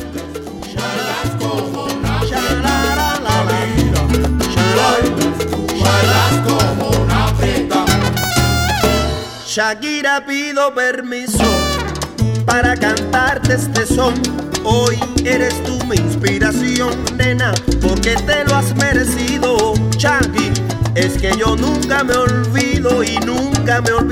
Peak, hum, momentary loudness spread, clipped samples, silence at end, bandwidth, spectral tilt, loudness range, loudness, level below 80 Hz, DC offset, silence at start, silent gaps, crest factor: 0 dBFS; none; 6 LU; under 0.1%; 0 s; over 20 kHz; -4.5 dB/octave; 2 LU; -15 LUFS; -26 dBFS; under 0.1%; 0 s; none; 14 dB